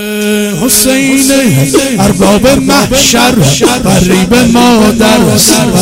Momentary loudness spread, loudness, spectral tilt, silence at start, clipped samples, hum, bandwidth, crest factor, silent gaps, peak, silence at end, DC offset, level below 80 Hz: 3 LU; -6 LUFS; -4 dB/octave; 0 s; 0.3%; none; 16.5 kHz; 6 dB; none; 0 dBFS; 0 s; under 0.1%; -28 dBFS